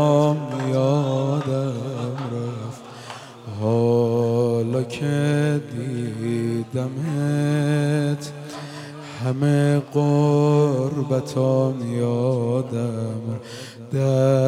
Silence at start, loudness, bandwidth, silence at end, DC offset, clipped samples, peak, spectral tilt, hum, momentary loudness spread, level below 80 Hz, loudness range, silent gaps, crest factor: 0 s; -22 LUFS; 12 kHz; 0 s; under 0.1%; under 0.1%; -6 dBFS; -7.5 dB/octave; none; 16 LU; -68 dBFS; 4 LU; none; 16 dB